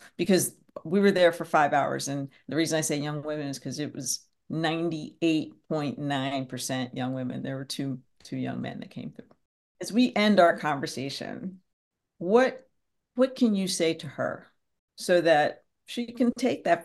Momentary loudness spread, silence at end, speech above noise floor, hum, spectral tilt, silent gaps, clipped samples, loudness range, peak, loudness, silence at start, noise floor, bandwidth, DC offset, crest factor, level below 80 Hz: 15 LU; 0 s; 49 dB; none; -4.5 dB/octave; 9.45-9.75 s, 11.73-11.91 s, 14.79-14.88 s; under 0.1%; 6 LU; -6 dBFS; -27 LUFS; 0 s; -76 dBFS; 12.5 kHz; under 0.1%; 20 dB; -72 dBFS